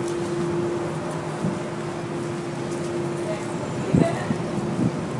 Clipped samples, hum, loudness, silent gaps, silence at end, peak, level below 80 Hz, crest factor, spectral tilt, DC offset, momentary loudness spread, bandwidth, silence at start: under 0.1%; none; -26 LUFS; none; 0 s; -2 dBFS; -54 dBFS; 22 dB; -6.5 dB/octave; under 0.1%; 7 LU; 11.5 kHz; 0 s